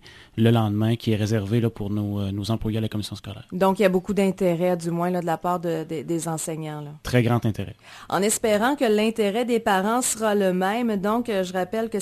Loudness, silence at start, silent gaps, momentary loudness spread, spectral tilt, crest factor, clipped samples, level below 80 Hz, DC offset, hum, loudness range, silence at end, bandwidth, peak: -23 LUFS; 0.05 s; none; 9 LU; -5.5 dB/octave; 18 dB; under 0.1%; -50 dBFS; under 0.1%; none; 3 LU; 0 s; 14 kHz; -4 dBFS